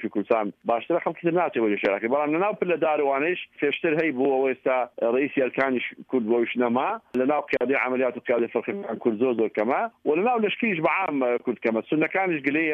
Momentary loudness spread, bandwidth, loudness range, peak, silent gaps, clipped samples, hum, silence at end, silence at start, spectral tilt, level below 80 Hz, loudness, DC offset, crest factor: 4 LU; 5.6 kHz; 1 LU; -8 dBFS; none; under 0.1%; none; 0 s; 0 s; -8 dB/octave; -72 dBFS; -24 LUFS; under 0.1%; 16 dB